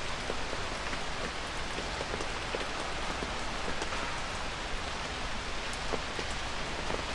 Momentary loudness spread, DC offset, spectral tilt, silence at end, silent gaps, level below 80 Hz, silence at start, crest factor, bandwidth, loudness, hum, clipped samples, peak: 2 LU; under 0.1%; -3 dB/octave; 0 s; none; -42 dBFS; 0 s; 18 dB; 11.5 kHz; -35 LUFS; none; under 0.1%; -18 dBFS